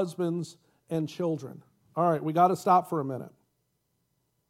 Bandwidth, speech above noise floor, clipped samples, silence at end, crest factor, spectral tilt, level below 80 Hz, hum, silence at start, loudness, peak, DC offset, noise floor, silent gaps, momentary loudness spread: 16 kHz; 48 dB; under 0.1%; 1.2 s; 20 dB; -7.5 dB/octave; -78 dBFS; none; 0 s; -28 LUFS; -8 dBFS; under 0.1%; -76 dBFS; none; 16 LU